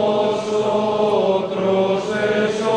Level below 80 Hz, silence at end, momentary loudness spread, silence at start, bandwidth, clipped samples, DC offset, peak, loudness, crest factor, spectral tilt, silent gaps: -56 dBFS; 0 s; 2 LU; 0 s; 10 kHz; under 0.1%; under 0.1%; -6 dBFS; -19 LUFS; 12 dB; -5.5 dB/octave; none